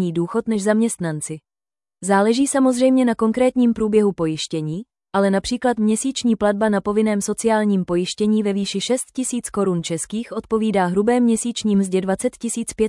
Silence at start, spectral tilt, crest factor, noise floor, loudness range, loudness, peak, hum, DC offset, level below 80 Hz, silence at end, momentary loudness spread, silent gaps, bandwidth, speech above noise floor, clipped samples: 0 s; -5 dB/octave; 14 dB; under -90 dBFS; 3 LU; -20 LUFS; -4 dBFS; none; under 0.1%; -52 dBFS; 0 s; 8 LU; none; 12 kHz; over 71 dB; under 0.1%